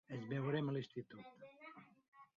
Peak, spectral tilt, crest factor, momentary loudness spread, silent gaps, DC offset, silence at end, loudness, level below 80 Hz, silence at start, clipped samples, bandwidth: -28 dBFS; -6.5 dB/octave; 18 dB; 19 LU; 2.08-2.12 s; under 0.1%; 0.15 s; -43 LUFS; -84 dBFS; 0.1 s; under 0.1%; 7 kHz